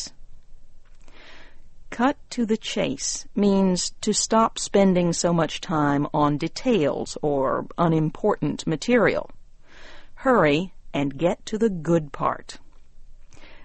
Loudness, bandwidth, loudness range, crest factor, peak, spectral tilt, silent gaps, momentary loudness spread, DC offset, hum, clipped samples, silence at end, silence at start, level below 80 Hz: -23 LUFS; 8.8 kHz; 4 LU; 18 dB; -6 dBFS; -5 dB/octave; none; 8 LU; under 0.1%; none; under 0.1%; 0 s; 0 s; -44 dBFS